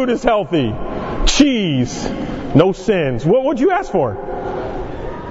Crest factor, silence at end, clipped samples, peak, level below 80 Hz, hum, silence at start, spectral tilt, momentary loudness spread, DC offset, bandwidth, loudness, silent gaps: 16 dB; 0 s; under 0.1%; 0 dBFS; -28 dBFS; none; 0 s; -5.5 dB/octave; 11 LU; under 0.1%; 8 kHz; -17 LUFS; none